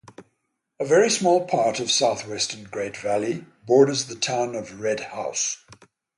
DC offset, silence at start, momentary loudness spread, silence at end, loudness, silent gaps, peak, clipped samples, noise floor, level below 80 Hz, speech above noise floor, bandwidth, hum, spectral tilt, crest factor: under 0.1%; 0.2 s; 11 LU; 0.45 s; -23 LUFS; none; -4 dBFS; under 0.1%; -76 dBFS; -66 dBFS; 53 dB; 11.5 kHz; none; -3 dB/octave; 20 dB